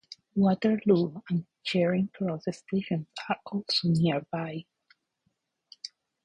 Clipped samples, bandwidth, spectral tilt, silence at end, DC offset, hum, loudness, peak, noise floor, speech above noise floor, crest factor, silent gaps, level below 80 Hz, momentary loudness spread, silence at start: under 0.1%; 10.5 kHz; -7 dB/octave; 0.35 s; under 0.1%; none; -28 LUFS; -10 dBFS; -77 dBFS; 50 dB; 20 dB; none; -66 dBFS; 14 LU; 0.1 s